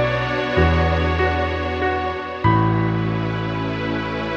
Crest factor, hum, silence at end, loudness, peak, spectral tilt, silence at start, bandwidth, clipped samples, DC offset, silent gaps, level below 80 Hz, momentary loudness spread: 16 dB; none; 0 s; -20 LUFS; -2 dBFS; -7.5 dB/octave; 0 s; 7 kHz; under 0.1%; under 0.1%; none; -30 dBFS; 6 LU